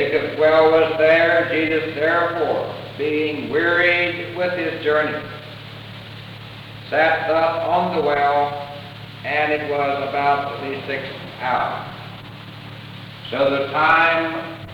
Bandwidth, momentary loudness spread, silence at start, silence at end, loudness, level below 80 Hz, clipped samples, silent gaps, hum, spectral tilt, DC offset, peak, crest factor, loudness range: 18 kHz; 21 LU; 0 s; 0 s; -19 LUFS; -56 dBFS; under 0.1%; none; none; -6.5 dB/octave; under 0.1%; -4 dBFS; 16 dB; 6 LU